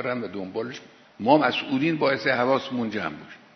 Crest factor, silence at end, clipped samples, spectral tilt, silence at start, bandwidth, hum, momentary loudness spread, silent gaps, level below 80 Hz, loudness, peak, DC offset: 20 dB; 0.2 s; under 0.1%; -6 dB/octave; 0 s; 6.4 kHz; none; 13 LU; none; -68 dBFS; -24 LUFS; -4 dBFS; under 0.1%